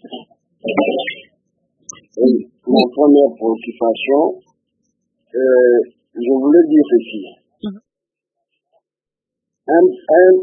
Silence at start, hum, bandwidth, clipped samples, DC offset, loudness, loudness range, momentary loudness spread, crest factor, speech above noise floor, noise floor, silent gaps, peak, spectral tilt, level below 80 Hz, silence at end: 0.05 s; none; 7 kHz; under 0.1%; under 0.1%; -14 LUFS; 4 LU; 20 LU; 16 dB; 75 dB; -87 dBFS; none; 0 dBFS; -6 dB/octave; -68 dBFS; 0 s